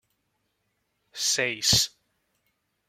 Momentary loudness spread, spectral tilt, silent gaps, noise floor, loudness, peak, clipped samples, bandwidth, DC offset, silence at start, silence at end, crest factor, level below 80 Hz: 9 LU; -1 dB/octave; none; -76 dBFS; -23 LUFS; -6 dBFS; under 0.1%; 16.5 kHz; under 0.1%; 1.15 s; 1 s; 24 dB; -56 dBFS